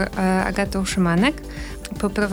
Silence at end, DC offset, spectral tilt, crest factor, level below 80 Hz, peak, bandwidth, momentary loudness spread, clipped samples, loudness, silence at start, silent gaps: 0 s; under 0.1%; -5.5 dB/octave; 18 dB; -36 dBFS; -4 dBFS; over 20 kHz; 14 LU; under 0.1%; -21 LUFS; 0 s; none